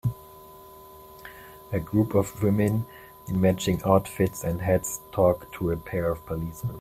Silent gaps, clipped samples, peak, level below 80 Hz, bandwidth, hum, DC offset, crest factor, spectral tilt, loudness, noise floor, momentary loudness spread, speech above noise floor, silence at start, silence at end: none; under 0.1%; -4 dBFS; -48 dBFS; 16 kHz; none; under 0.1%; 22 dB; -6.5 dB/octave; -26 LUFS; -47 dBFS; 23 LU; 22 dB; 0.05 s; 0 s